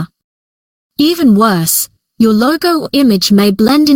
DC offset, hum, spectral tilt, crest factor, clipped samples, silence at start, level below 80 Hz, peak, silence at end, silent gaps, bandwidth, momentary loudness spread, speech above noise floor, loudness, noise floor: under 0.1%; none; -4.5 dB/octave; 10 dB; under 0.1%; 0 s; -48 dBFS; 0 dBFS; 0 s; 0.24-0.90 s; 17 kHz; 5 LU; over 81 dB; -10 LUFS; under -90 dBFS